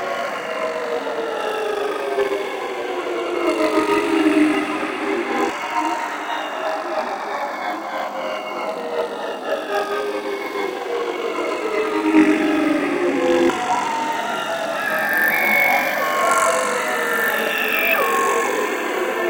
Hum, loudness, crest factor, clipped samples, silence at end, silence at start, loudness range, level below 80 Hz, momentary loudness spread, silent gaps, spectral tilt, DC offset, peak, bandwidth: none; -20 LUFS; 18 dB; under 0.1%; 0 s; 0 s; 7 LU; -62 dBFS; 9 LU; none; -3 dB/octave; under 0.1%; -2 dBFS; 17 kHz